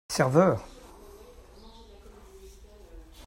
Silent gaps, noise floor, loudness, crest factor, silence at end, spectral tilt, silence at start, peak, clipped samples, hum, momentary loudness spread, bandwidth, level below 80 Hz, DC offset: none; -50 dBFS; -24 LUFS; 22 dB; 0.05 s; -6 dB/octave; 0.1 s; -8 dBFS; under 0.1%; none; 28 LU; 16 kHz; -52 dBFS; under 0.1%